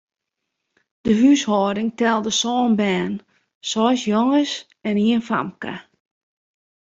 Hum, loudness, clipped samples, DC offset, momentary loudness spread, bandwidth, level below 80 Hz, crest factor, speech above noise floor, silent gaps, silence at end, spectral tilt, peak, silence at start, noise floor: none; -20 LUFS; under 0.1%; under 0.1%; 13 LU; 7.8 kHz; -60 dBFS; 18 dB; 61 dB; 3.55-3.61 s; 1.1 s; -4.5 dB/octave; -4 dBFS; 1.05 s; -80 dBFS